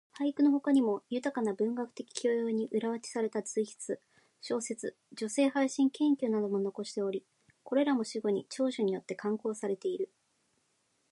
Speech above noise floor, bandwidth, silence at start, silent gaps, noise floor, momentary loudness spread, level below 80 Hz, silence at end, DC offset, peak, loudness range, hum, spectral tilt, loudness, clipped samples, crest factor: 44 dB; 11.5 kHz; 0.15 s; none; -75 dBFS; 11 LU; -86 dBFS; 1.05 s; under 0.1%; -14 dBFS; 4 LU; none; -5 dB/octave; -33 LUFS; under 0.1%; 18 dB